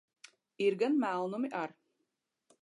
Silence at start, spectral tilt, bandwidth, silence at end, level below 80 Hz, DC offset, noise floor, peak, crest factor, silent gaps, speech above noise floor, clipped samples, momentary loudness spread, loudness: 0.6 s; -6 dB/octave; 11 kHz; 0.9 s; -90 dBFS; under 0.1%; -84 dBFS; -20 dBFS; 16 dB; none; 51 dB; under 0.1%; 9 LU; -33 LUFS